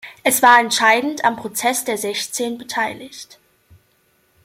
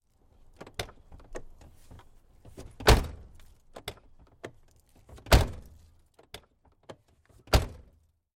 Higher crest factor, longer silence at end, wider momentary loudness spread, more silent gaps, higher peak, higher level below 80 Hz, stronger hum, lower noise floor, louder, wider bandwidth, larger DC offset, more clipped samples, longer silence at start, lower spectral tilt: about the same, 18 dB vs 22 dB; first, 1.2 s vs 0.65 s; second, 13 LU vs 28 LU; neither; first, 0 dBFS vs -10 dBFS; second, -64 dBFS vs -36 dBFS; neither; about the same, -61 dBFS vs -64 dBFS; first, -17 LUFS vs -28 LUFS; about the same, 16.5 kHz vs 16.5 kHz; neither; neither; second, 0.05 s vs 0.8 s; second, -1 dB/octave vs -4.5 dB/octave